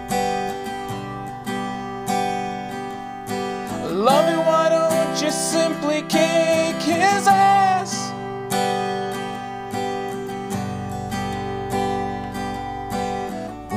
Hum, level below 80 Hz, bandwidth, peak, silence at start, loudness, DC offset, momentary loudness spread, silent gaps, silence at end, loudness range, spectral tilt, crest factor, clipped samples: none; -48 dBFS; 15.5 kHz; -4 dBFS; 0 s; -22 LUFS; under 0.1%; 12 LU; none; 0 s; 8 LU; -4 dB/octave; 18 dB; under 0.1%